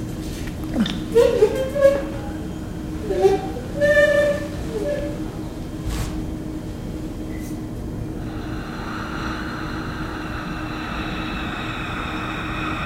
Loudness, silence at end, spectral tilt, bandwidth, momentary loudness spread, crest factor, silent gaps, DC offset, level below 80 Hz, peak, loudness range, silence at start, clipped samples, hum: -24 LUFS; 0 s; -6 dB/octave; 16 kHz; 13 LU; 20 dB; none; under 0.1%; -34 dBFS; -2 dBFS; 9 LU; 0 s; under 0.1%; none